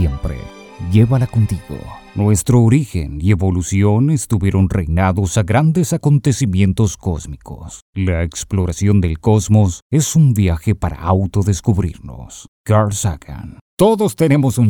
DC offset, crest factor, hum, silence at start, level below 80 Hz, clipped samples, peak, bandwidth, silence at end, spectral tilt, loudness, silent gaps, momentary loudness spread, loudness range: under 0.1%; 14 dB; none; 0 s; -32 dBFS; under 0.1%; 0 dBFS; 17.5 kHz; 0 s; -6.5 dB/octave; -16 LUFS; 7.82-7.93 s, 9.82-9.90 s, 12.48-12.64 s, 13.61-13.77 s; 17 LU; 3 LU